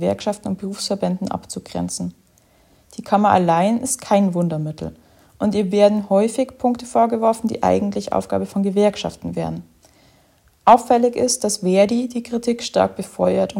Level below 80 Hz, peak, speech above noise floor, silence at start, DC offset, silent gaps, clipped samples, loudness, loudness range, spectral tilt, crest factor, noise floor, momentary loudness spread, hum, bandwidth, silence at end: -54 dBFS; 0 dBFS; 38 dB; 0 s; under 0.1%; none; under 0.1%; -19 LUFS; 4 LU; -5.5 dB/octave; 20 dB; -56 dBFS; 12 LU; none; 16 kHz; 0 s